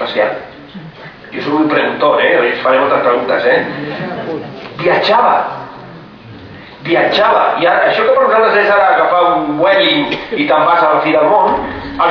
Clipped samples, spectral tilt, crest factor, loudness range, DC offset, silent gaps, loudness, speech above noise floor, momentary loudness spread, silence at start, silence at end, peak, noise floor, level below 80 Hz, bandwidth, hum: under 0.1%; -6.5 dB/octave; 12 dB; 5 LU; under 0.1%; none; -12 LUFS; 22 dB; 17 LU; 0 s; 0 s; 0 dBFS; -33 dBFS; -48 dBFS; 5.4 kHz; none